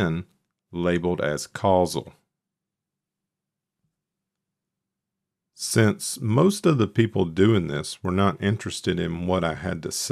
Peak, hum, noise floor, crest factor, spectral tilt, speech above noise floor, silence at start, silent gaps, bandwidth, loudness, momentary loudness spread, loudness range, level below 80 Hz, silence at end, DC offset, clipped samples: -6 dBFS; none; -86 dBFS; 20 dB; -5.5 dB/octave; 63 dB; 0 s; none; 14.5 kHz; -24 LUFS; 9 LU; 7 LU; -54 dBFS; 0 s; under 0.1%; under 0.1%